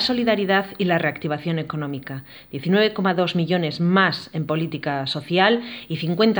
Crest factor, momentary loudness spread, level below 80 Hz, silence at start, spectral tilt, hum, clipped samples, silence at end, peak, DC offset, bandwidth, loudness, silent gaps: 18 dB; 12 LU; -62 dBFS; 0 s; -7 dB/octave; none; under 0.1%; 0 s; -2 dBFS; under 0.1%; over 20 kHz; -21 LUFS; none